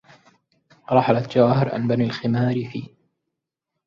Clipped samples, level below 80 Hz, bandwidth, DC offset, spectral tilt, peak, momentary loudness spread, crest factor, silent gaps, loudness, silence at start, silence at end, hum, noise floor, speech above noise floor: under 0.1%; -60 dBFS; 7.2 kHz; under 0.1%; -8.5 dB/octave; -2 dBFS; 9 LU; 20 dB; none; -20 LUFS; 0.9 s; 1 s; none; -82 dBFS; 62 dB